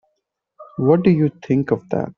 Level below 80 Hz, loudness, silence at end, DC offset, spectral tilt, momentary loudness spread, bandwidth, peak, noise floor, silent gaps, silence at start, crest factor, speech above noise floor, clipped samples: -54 dBFS; -18 LUFS; 0.05 s; under 0.1%; -9 dB/octave; 7 LU; 6.4 kHz; -4 dBFS; -74 dBFS; none; 0.6 s; 16 dB; 57 dB; under 0.1%